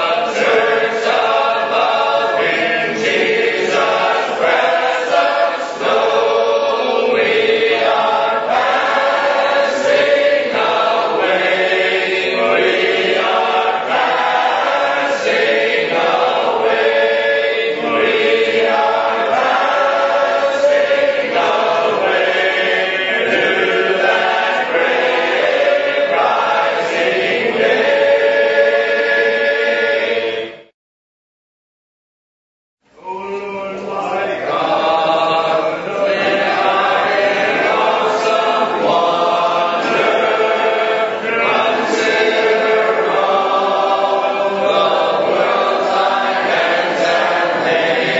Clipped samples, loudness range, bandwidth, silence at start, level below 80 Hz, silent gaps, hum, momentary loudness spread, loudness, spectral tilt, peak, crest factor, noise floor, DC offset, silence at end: under 0.1%; 3 LU; 8 kHz; 0 s; -62 dBFS; 30.74-32.77 s; none; 3 LU; -14 LUFS; -3.5 dB/octave; -2 dBFS; 14 dB; under -90 dBFS; under 0.1%; 0 s